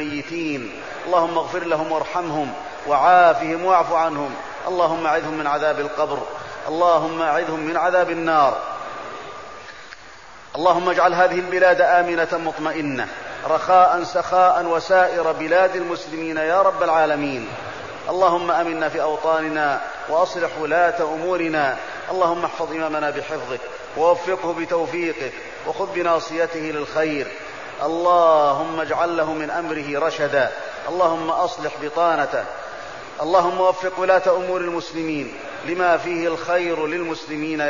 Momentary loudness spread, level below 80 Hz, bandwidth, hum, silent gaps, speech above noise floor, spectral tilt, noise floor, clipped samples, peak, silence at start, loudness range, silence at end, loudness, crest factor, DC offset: 13 LU; -58 dBFS; 7.4 kHz; none; none; 23 dB; -5 dB/octave; -42 dBFS; under 0.1%; -4 dBFS; 0 s; 4 LU; 0 s; -20 LUFS; 16 dB; 0.5%